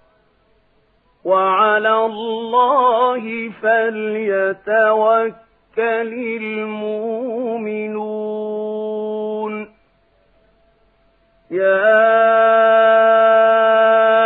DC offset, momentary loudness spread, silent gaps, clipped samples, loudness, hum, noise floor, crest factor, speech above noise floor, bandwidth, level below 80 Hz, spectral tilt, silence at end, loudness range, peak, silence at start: under 0.1%; 12 LU; none; under 0.1%; -16 LUFS; none; -58 dBFS; 14 dB; 42 dB; 4 kHz; -68 dBFS; -8 dB/octave; 0 s; 12 LU; -2 dBFS; 1.25 s